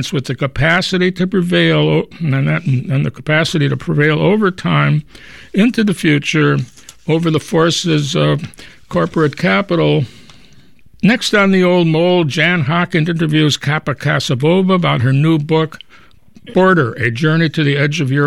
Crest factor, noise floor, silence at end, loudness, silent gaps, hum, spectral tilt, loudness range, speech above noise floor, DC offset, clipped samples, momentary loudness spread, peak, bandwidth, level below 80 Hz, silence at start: 14 dB; -47 dBFS; 0 s; -14 LUFS; none; none; -6 dB/octave; 2 LU; 33 dB; 0.5%; under 0.1%; 6 LU; -2 dBFS; 12.5 kHz; -44 dBFS; 0 s